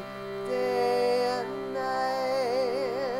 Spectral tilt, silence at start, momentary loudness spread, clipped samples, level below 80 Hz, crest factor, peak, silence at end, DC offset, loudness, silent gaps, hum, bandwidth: -4.5 dB/octave; 0 s; 7 LU; under 0.1%; -62 dBFS; 12 dB; -16 dBFS; 0 s; under 0.1%; -28 LUFS; none; none; 16 kHz